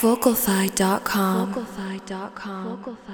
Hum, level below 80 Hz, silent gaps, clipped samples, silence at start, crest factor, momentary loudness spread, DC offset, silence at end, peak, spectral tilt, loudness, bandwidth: none; -54 dBFS; none; under 0.1%; 0 s; 18 dB; 14 LU; under 0.1%; 0 s; -4 dBFS; -4.5 dB/octave; -24 LUFS; over 20 kHz